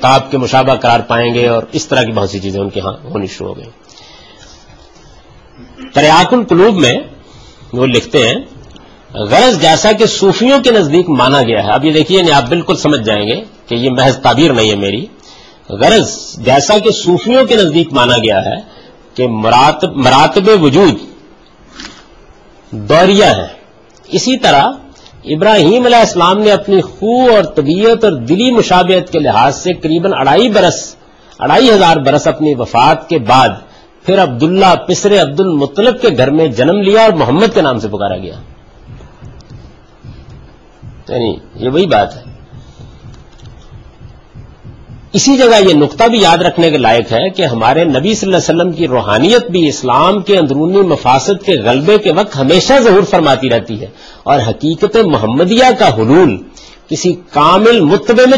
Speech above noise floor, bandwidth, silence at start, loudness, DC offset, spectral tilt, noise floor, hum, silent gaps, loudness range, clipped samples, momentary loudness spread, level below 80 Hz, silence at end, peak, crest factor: 32 dB; 10.5 kHz; 0 s; -9 LUFS; 0.4%; -5 dB/octave; -41 dBFS; none; none; 8 LU; under 0.1%; 11 LU; -40 dBFS; 0 s; 0 dBFS; 10 dB